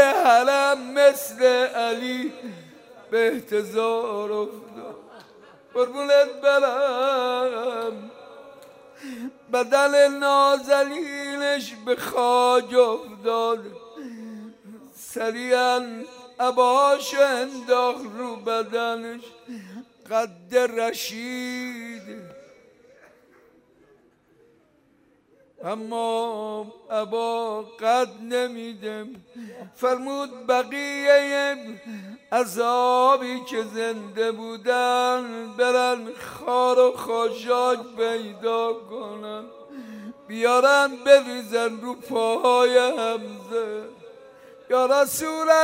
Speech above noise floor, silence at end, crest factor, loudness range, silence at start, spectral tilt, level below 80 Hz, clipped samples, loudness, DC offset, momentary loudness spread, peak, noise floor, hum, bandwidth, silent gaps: 38 dB; 0 s; 20 dB; 7 LU; 0 s; -2.5 dB/octave; -74 dBFS; under 0.1%; -22 LUFS; under 0.1%; 21 LU; -2 dBFS; -61 dBFS; none; 16 kHz; none